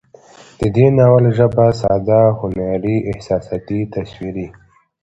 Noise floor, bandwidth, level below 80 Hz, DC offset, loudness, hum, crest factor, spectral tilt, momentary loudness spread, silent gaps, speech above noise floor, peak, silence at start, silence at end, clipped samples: -43 dBFS; 8 kHz; -40 dBFS; under 0.1%; -15 LUFS; none; 16 dB; -9 dB/octave; 15 LU; none; 29 dB; 0 dBFS; 0.6 s; 0.5 s; under 0.1%